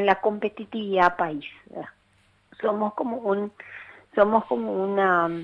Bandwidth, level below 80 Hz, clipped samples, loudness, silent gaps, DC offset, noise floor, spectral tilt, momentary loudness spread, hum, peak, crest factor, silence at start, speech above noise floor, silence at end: 7 kHz; -62 dBFS; under 0.1%; -24 LUFS; none; under 0.1%; -63 dBFS; -7.5 dB/octave; 18 LU; none; -4 dBFS; 20 dB; 0 s; 38 dB; 0 s